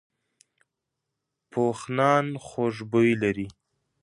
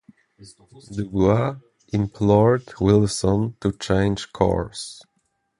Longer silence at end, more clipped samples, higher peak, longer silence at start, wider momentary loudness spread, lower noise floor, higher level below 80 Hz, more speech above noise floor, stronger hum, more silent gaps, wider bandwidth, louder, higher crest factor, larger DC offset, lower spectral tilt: second, 0.5 s vs 0.65 s; neither; second, -6 dBFS vs -2 dBFS; first, 1.55 s vs 0.4 s; about the same, 12 LU vs 14 LU; first, -83 dBFS vs -71 dBFS; second, -62 dBFS vs -42 dBFS; first, 59 dB vs 50 dB; neither; neither; about the same, 11.5 kHz vs 11.5 kHz; second, -25 LUFS vs -21 LUFS; about the same, 20 dB vs 20 dB; neither; about the same, -6.5 dB/octave vs -6.5 dB/octave